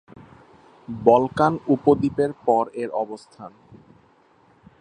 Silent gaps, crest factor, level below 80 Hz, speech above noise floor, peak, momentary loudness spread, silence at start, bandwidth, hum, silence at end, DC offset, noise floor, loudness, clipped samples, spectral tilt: none; 22 dB; -56 dBFS; 36 dB; -2 dBFS; 21 LU; 0.9 s; 10 kHz; none; 1.3 s; under 0.1%; -57 dBFS; -21 LUFS; under 0.1%; -8 dB/octave